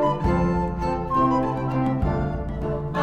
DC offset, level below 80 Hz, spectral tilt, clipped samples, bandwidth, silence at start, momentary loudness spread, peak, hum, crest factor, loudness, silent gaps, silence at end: under 0.1%; -32 dBFS; -9 dB/octave; under 0.1%; 8.4 kHz; 0 s; 7 LU; -10 dBFS; none; 12 dB; -24 LUFS; none; 0 s